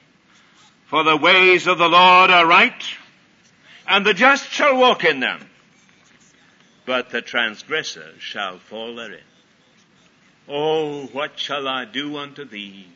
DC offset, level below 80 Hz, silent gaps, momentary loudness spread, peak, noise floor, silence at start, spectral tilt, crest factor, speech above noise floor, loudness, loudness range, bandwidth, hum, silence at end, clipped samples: under 0.1%; -74 dBFS; none; 22 LU; -2 dBFS; -56 dBFS; 0.9 s; -3 dB/octave; 18 dB; 38 dB; -16 LUFS; 14 LU; 7.8 kHz; none; 0.15 s; under 0.1%